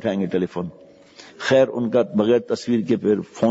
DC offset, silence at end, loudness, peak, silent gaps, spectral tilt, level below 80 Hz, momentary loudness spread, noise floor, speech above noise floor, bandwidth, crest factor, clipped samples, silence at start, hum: under 0.1%; 0 s; -21 LUFS; -4 dBFS; none; -6.5 dB/octave; -64 dBFS; 10 LU; -46 dBFS; 26 dB; 8 kHz; 16 dB; under 0.1%; 0 s; none